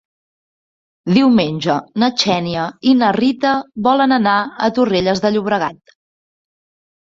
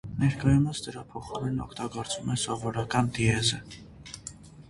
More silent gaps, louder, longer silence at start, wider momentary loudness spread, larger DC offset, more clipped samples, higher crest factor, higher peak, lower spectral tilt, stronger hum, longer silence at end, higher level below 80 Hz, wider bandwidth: neither; first, -15 LUFS vs -28 LUFS; first, 1.05 s vs 0.05 s; second, 6 LU vs 17 LU; neither; neither; about the same, 16 dB vs 20 dB; first, -2 dBFS vs -10 dBFS; about the same, -5.5 dB/octave vs -5 dB/octave; neither; first, 1.3 s vs 0.05 s; second, -54 dBFS vs -48 dBFS; second, 7.6 kHz vs 11.5 kHz